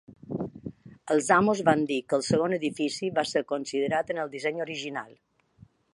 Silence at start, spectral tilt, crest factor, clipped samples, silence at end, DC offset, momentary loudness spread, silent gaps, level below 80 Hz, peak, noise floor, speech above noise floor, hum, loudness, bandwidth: 0.1 s; -5 dB/octave; 22 dB; under 0.1%; 0.9 s; under 0.1%; 16 LU; none; -64 dBFS; -6 dBFS; -58 dBFS; 31 dB; none; -27 LUFS; 11.5 kHz